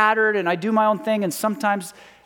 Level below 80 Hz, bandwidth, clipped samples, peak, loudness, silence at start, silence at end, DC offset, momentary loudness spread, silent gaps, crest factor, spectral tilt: -72 dBFS; 18.5 kHz; under 0.1%; -4 dBFS; -21 LUFS; 0 s; 0.35 s; under 0.1%; 5 LU; none; 18 dB; -4.5 dB/octave